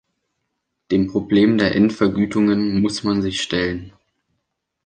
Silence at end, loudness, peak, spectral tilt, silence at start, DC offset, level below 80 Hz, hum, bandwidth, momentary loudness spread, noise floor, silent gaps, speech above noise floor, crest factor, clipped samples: 0.95 s; -18 LUFS; -4 dBFS; -6 dB/octave; 0.9 s; under 0.1%; -46 dBFS; none; 9.2 kHz; 6 LU; -76 dBFS; none; 58 dB; 16 dB; under 0.1%